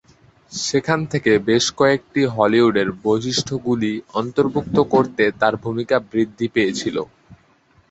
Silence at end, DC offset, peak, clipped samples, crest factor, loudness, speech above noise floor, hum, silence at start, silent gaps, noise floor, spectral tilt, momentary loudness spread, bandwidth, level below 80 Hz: 0.55 s; under 0.1%; -2 dBFS; under 0.1%; 18 dB; -19 LUFS; 38 dB; none; 0.5 s; none; -56 dBFS; -5 dB/octave; 8 LU; 8.2 kHz; -52 dBFS